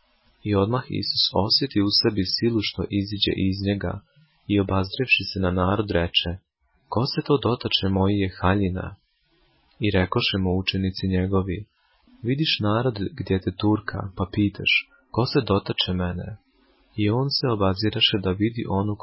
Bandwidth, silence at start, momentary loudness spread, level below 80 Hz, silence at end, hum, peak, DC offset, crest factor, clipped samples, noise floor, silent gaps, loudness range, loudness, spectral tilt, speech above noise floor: 5.8 kHz; 0.45 s; 10 LU; -40 dBFS; 0.05 s; none; -6 dBFS; under 0.1%; 16 dB; under 0.1%; -65 dBFS; none; 3 LU; -23 LUFS; -9 dB/octave; 42 dB